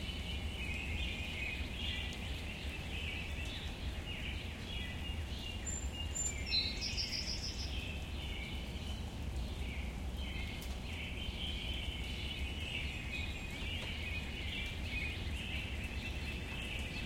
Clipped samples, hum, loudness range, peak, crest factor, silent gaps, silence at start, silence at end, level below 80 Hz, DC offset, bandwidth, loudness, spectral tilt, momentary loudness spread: under 0.1%; none; 4 LU; -22 dBFS; 18 dB; none; 0 s; 0 s; -44 dBFS; under 0.1%; 16.5 kHz; -40 LUFS; -3.5 dB/octave; 6 LU